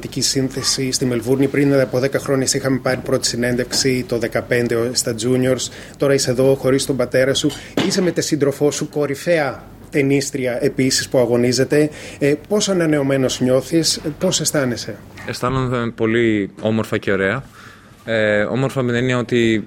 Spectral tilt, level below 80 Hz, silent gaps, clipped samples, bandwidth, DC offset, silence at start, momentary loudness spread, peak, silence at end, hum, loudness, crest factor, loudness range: -4.5 dB/octave; -46 dBFS; none; under 0.1%; 16.5 kHz; under 0.1%; 0 s; 5 LU; -4 dBFS; 0 s; none; -18 LUFS; 14 dB; 2 LU